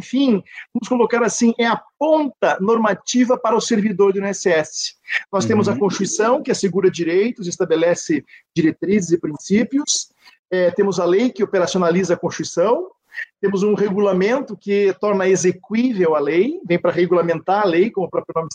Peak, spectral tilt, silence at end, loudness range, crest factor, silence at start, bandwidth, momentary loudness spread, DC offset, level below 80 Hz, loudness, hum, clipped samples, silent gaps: -4 dBFS; -5 dB/octave; 0 s; 2 LU; 14 dB; 0 s; 9.6 kHz; 6 LU; under 0.1%; -64 dBFS; -18 LUFS; none; under 0.1%; 10.39-10.45 s